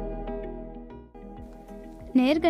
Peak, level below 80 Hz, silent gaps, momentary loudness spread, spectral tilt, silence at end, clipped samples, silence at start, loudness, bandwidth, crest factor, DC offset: -8 dBFS; -42 dBFS; none; 21 LU; -6.5 dB/octave; 0 s; under 0.1%; 0 s; -29 LUFS; 12.5 kHz; 20 dB; under 0.1%